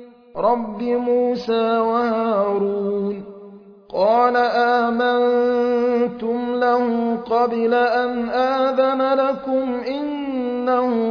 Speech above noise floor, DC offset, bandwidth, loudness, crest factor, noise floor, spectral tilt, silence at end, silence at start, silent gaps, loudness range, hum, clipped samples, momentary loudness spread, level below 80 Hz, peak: 23 dB; under 0.1%; 5.4 kHz; -19 LUFS; 14 dB; -42 dBFS; -7 dB/octave; 0 s; 0 s; none; 2 LU; none; under 0.1%; 7 LU; -58 dBFS; -4 dBFS